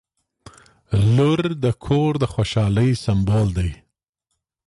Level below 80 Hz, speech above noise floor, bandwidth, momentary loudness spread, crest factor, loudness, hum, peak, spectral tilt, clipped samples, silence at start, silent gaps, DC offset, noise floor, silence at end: -36 dBFS; 59 dB; 11.5 kHz; 7 LU; 14 dB; -20 LUFS; none; -6 dBFS; -7.5 dB/octave; under 0.1%; 0.9 s; none; under 0.1%; -77 dBFS; 0.9 s